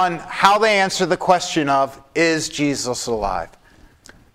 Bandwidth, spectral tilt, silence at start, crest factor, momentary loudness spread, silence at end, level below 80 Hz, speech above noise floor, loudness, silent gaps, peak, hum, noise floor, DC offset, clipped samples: 16 kHz; -3.5 dB/octave; 0 s; 20 dB; 8 LU; 0.85 s; -44 dBFS; 30 dB; -18 LUFS; none; 0 dBFS; none; -49 dBFS; under 0.1%; under 0.1%